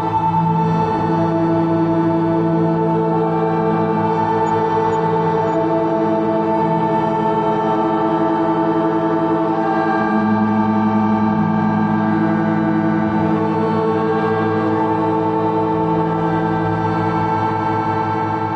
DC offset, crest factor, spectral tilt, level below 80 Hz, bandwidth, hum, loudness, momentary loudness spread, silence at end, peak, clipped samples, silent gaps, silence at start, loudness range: under 0.1%; 12 dB; -9 dB/octave; -48 dBFS; 7.2 kHz; none; -17 LUFS; 2 LU; 0 s; -6 dBFS; under 0.1%; none; 0 s; 1 LU